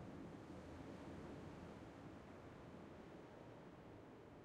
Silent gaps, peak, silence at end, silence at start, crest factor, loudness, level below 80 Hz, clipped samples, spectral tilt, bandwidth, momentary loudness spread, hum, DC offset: none; -42 dBFS; 0 s; 0 s; 14 dB; -57 LUFS; -72 dBFS; under 0.1%; -7 dB/octave; 12 kHz; 5 LU; none; under 0.1%